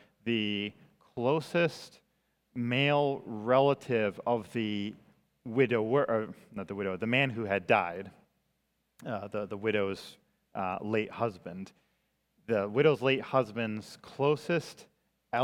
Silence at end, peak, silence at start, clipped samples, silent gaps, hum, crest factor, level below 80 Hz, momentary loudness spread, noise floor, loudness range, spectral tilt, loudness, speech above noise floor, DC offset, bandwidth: 0 s; -10 dBFS; 0.25 s; under 0.1%; none; none; 22 dB; -74 dBFS; 18 LU; -78 dBFS; 5 LU; -6.5 dB/octave; -31 LUFS; 47 dB; under 0.1%; 14 kHz